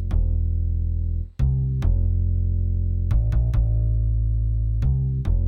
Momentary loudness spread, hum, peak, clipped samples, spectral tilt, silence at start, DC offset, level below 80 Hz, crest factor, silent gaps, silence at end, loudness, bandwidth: 3 LU; none; -10 dBFS; under 0.1%; -10 dB/octave; 0 s; under 0.1%; -22 dBFS; 10 dB; none; 0 s; -24 LUFS; 3.8 kHz